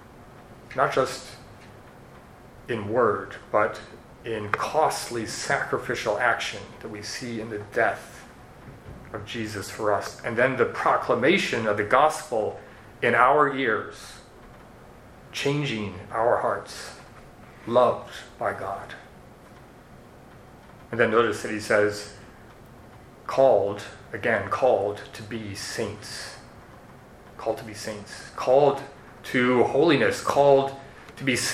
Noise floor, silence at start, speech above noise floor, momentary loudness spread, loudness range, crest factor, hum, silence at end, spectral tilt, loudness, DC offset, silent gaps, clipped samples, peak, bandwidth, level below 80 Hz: -48 dBFS; 0.1 s; 24 dB; 21 LU; 7 LU; 24 dB; none; 0 s; -4.5 dB/octave; -24 LUFS; under 0.1%; none; under 0.1%; -4 dBFS; 15.5 kHz; -56 dBFS